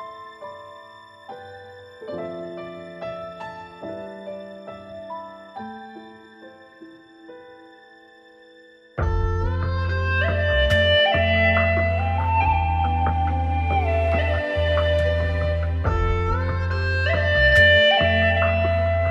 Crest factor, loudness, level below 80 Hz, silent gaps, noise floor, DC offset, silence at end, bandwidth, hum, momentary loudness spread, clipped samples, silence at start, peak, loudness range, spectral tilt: 18 dB; -20 LUFS; -32 dBFS; none; -50 dBFS; under 0.1%; 0 s; 7 kHz; none; 22 LU; under 0.1%; 0 s; -4 dBFS; 20 LU; -6.5 dB/octave